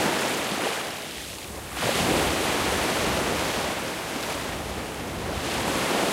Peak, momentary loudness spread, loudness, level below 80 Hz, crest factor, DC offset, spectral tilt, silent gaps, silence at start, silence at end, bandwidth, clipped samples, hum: -10 dBFS; 9 LU; -26 LUFS; -44 dBFS; 16 dB; under 0.1%; -3 dB/octave; none; 0 s; 0 s; 16 kHz; under 0.1%; none